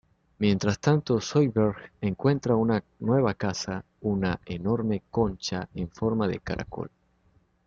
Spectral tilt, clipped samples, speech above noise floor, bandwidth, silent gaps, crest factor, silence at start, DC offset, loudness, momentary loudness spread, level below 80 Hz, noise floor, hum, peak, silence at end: -6.5 dB/octave; under 0.1%; 39 dB; 7.6 kHz; none; 18 dB; 0.4 s; under 0.1%; -27 LUFS; 9 LU; -52 dBFS; -65 dBFS; none; -10 dBFS; 0.8 s